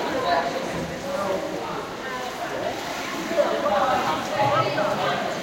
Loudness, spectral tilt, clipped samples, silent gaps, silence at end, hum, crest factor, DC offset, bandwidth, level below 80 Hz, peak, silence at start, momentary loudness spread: -25 LUFS; -4 dB/octave; under 0.1%; none; 0 s; none; 16 dB; under 0.1%; 16.5 kHz; -54 dBFS; -8 dBFS; 0 s; 8 LU